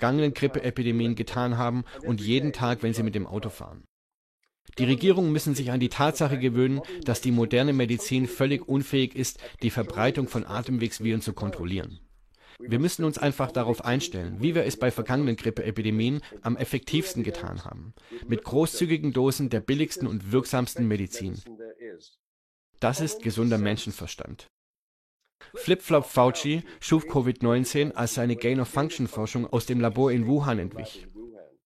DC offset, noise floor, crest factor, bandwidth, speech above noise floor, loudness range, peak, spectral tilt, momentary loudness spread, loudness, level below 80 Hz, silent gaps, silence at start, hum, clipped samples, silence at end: under 0.1%; -56 dBFS; 20 dB; 15 kHz; 30 dB; 5 LU; -8 dBFS; -6 dB/octave; 14 LU; -26 LUFS; -54 dBFS; 3.88-4.40 s, 4.61-4.65 s, 22.19-22.73 s, 24.50-25.20 s, 25.35-25.39 s; 0 s; none; under 0.1%; 0.2 s